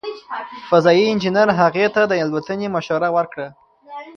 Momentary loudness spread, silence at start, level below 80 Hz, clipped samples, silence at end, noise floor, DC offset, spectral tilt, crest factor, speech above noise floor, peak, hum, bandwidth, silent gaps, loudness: 16 LU; 0.05 s; -60 dBFS; under 0.1%; 0.05 s; -37 dBFS; under 0.1%; -6 dB/octave; 18 dB; 19 dB; 0 dBFS; none; 7 kHz; none; -17 LUFS